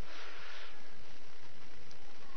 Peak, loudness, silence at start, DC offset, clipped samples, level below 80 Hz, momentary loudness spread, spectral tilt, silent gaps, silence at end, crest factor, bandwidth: -26 dBFS; -53 LUFS; 0 s; 4%; under 0.1%; -66 dBFS; 8 LU; -4 dB/octave; none; 0 s; 14 dB; 6.6 kHz